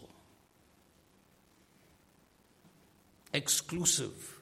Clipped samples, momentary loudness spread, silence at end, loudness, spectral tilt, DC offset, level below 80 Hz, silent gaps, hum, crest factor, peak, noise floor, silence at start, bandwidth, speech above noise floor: under 0.1%; 8 LU; 0.05 s; -31 LUFS; -2 dB/octave; under 0.1%; -70 dBFS; none; none; 26 dB; -14 dBFS; -66 dBFS; 0 s; 16.5 kHz; 33 dB